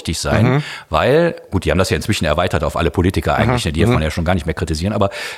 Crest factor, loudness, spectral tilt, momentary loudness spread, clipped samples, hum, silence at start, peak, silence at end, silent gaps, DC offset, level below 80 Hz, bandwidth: 14 dB; -17 LUFS; -5.5 dB/octave; 5 LU; under 0.1%; none; 0 s; -2 dBFS; 0 s; none; under 0.1%; -32 dBFS; 15.5 kHz